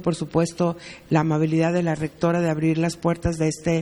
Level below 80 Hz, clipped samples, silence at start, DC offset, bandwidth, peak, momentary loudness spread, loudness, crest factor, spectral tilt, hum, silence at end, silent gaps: -46 dBFS; under 0.1%; 0 s; under 0.1%; 12 kHz; -4 dBFS; 4 LU; -23 LUFS; 18 dB; -7 dB/octave; none; 0 s; none